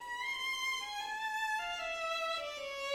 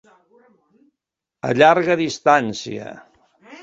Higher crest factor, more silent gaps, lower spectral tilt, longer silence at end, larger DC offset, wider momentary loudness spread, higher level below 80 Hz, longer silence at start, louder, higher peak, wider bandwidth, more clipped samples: second, 14 dB vs 20 dB; neither; second, 1 dB/octave vs -5 dB/octave; about the same, 0 s vs 0.1 s; neither; second, 4 LU vs 18 LU; second, -68 dBFS vs -62 dBFS; second, 0 s vs 1.45 s; second, -36 LUFS vs -17 LUFS; second, -24 dBFS vs 0 dBFS; first, 16 kHz vs 7.8 kHz; neither